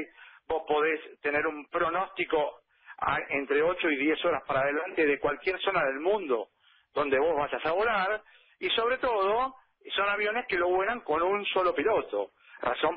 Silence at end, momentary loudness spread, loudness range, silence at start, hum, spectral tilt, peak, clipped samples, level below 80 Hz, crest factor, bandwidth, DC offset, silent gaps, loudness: 0 s; 8 LU; 2 LU; 0 s; none; -8 dB/octave; -14 dBFS; under 0.1%; -60 dBFS; 16 dB; 5.2 kHz; under 0.1%; none; -28 LUFS